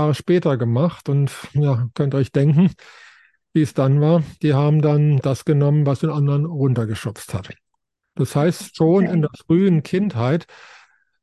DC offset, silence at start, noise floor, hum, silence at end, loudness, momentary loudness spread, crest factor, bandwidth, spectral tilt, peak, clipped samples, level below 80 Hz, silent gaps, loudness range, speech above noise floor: under 0.1%; 0 s; -76 dBFS; none; 0.8 s; -19 LUFS; 7 LU; 14 dB; 12.5 kHz; -8 dB/octave; -4 dBFS; under 0.1%; -52 dBFS; none; 3 LU; 58 dB